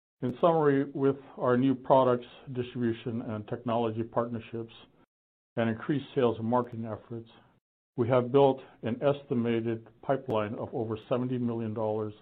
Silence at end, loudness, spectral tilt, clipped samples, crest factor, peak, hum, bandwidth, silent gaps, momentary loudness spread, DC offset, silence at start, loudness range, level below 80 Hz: 0.1 s; -30 LUFS; -10.5 dB/octave; under 0.1%; 22 dB; -8 dBFS; none; 4.5 kHz; 5.07-5.56 s, 7.61-7.93 s; 14 LU; under 0.1%; 0.2 s; 6 LU; -68 dBFS